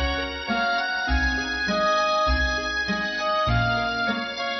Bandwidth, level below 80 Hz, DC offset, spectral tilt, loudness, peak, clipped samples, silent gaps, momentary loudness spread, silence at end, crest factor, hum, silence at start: 6.2 kHz; -34 dBFS; under 0.1%; -4.5 dB/octave; -23 LUFS; -10 dBFS; under 0.1%; none; 4 LU; 0 s; 14 dB; none; 0 s